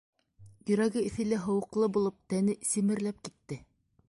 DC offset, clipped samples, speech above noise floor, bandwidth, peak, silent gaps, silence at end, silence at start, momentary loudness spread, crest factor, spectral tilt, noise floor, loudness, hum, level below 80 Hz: under 0.1%; under 0.1%; 27 dB; 11.5 kHz; -16 dBFS; none; 0.5 s; 0.4 s; 15 LU; 16 dB; -5.5 dB/octave; -57 dBFS; -30 LUFS; none; -64 dBFS